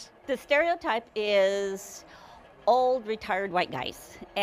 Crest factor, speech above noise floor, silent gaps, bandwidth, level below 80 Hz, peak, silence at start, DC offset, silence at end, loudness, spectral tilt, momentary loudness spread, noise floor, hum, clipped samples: 16 dB; 24 dB; none; 15.5 kHz; -62 dBFS; -12 dBFS; 0 s; under 0.1%; 0 s; -27 LUFS; -3.5 dB/octave; 13 LU; -51 dBFS; none; under 0.1%